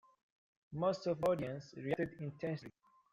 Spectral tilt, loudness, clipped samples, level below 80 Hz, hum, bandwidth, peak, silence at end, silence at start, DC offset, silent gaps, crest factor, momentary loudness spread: -7 dB/octave; -39 LUFS; under 0.1%; -72 dBFS; none; 14 kHz; -24 dBFS; 0.4 s; 0.7 s; under 0.1%; none; 16 dB; 11 LU